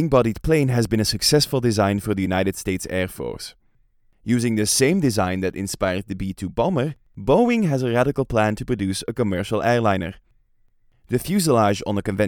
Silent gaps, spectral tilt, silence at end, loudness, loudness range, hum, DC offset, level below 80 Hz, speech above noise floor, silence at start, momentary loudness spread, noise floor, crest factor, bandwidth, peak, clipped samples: none; -5 dB/octave; 0 s; -21 LUFS; 2 LU; none; under 0.1%; -42 dBFS; 39 dB; 0 s; 10 LU; -59 dBFS; 18 dB; 18.5 kHz; -4 dBFS; under 0.1%